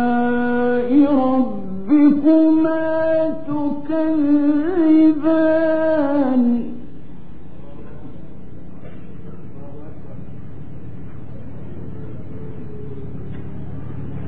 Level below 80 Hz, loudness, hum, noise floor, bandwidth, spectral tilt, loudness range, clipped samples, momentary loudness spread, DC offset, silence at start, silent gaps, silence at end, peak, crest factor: -46 dBFS; -17 LUFS; none; -39 dBFS; 4.7 kHz; -11.5 dB/octave; 21 LU; under 0.1%; 24 LU; 5%; 0 s; none; 0 s; -4 dBFS; 14 dB